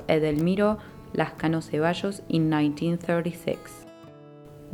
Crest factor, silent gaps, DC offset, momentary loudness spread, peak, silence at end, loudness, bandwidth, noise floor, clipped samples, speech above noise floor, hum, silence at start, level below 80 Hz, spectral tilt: 18 dB; none; under 0.1%; 14 LU; -8 dBFS; 0 s; -26 LUFS; 18 kHz; -47 dBFS; under 0.1%; 21 dB; none; 0 s; -54 dBFS; -7 dB/octave